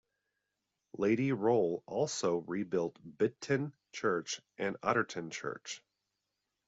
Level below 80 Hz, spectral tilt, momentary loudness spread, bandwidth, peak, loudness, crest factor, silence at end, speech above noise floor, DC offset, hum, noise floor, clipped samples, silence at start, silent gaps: -76 dBFS; -5 dB/octave; 11 LU; 8 kHz; -14 dBFS; -34 LUFS; 20 dB; 0.9 s; 52 dB; under 0.1%; none; -86 dBFS; under 0.1%; 0.95 s; none